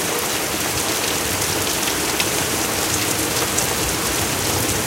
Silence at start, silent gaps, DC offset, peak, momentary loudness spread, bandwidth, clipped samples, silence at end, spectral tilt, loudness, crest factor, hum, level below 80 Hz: 0 s; none; under 0.1%; -2 dBFS; 1 LU; 17 kHz; under 0.1%; 0 s; -2 dB/octave; -19 LUFS; 18 dB; none; -40 dBFS